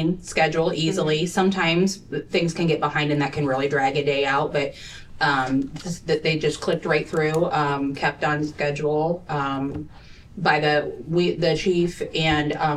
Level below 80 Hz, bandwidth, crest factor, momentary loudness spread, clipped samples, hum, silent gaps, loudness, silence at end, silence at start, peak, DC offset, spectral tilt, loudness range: -48 dBFS; 13.5 kHz; 18 dB; 6 LU; under 0.1%; none; none; -22 LUFS; 0 s; 0 s; -4 dBFS; under 0.1%; -5.5 dB/octave; 2 LU